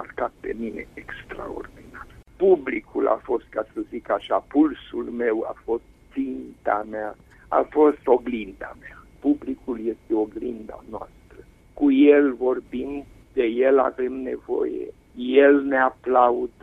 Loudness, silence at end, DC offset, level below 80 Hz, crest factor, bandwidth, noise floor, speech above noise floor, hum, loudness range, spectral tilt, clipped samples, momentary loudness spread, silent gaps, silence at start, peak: -23 LUFS; 0.15 s; under 0.1%; -52 dBFS; 20 dB; 3.9 kHz; -49 dBFS; 26 dB; none; 6 LU; -7.5 dB/octave; under 0.1%; 19 LU; none; 0 s; -4 dBFS